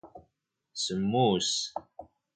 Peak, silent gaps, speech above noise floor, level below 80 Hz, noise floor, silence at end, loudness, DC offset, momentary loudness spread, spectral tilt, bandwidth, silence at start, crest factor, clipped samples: -14 dBFS; none; 51 dB; -64 dBFS; -80 dBFS; 0.3 s; -28 LUFS; under 0.1%; 15 LU; -4 dB/octave; 9.4 kHz; 0.05 s; 18 dB; under 0.1%